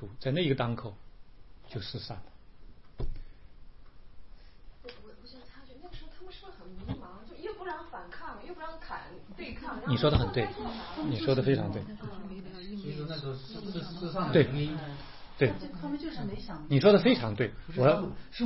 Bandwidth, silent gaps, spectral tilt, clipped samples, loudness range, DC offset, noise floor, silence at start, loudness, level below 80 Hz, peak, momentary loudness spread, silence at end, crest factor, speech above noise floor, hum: 5.8 kHz; none; -10.5 dB/octave; under 0.1%; 22 LU; 0.3%; -52 dBFS; 0 s; -31 LUFS; -48 dBFS; -10 dBFS; 23 LU; 0 s; 22 dB; 22 dB; none